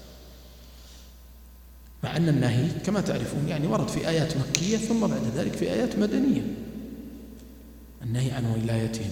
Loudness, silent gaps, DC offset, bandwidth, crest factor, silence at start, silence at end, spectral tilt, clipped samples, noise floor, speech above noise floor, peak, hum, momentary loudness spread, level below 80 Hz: -26 LUFS; none; under 0.1%; 18.5 kHz; 28 dB; 0 s; 0 s; -6 dB/octave; under 0.1%; -48 dBFS; 22 dB; 0 dBFS; none; 22 LU; -48 dBFS